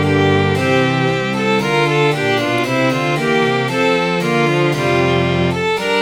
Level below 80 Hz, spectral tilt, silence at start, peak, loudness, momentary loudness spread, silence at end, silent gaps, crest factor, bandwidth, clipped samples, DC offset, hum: -46 dBFS; -5.5 dB/octave; 0 s; -2 dBFS; -15 LUFS; 2 LU; 0 s; none; 14 dB; 18 kHz; under 0.1%; under 0.1%; none